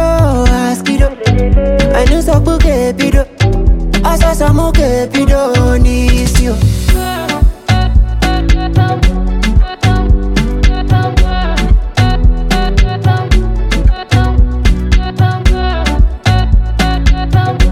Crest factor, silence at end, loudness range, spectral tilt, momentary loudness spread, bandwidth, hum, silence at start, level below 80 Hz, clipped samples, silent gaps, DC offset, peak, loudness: 10 dB; 0 s; 2 LU; -6 dB/octave; 3 LU; 15 kHz; none; 0 s; -12 dBFS; under 0.1%; none; under 0.1%; 0 dBFS; -12 LUFS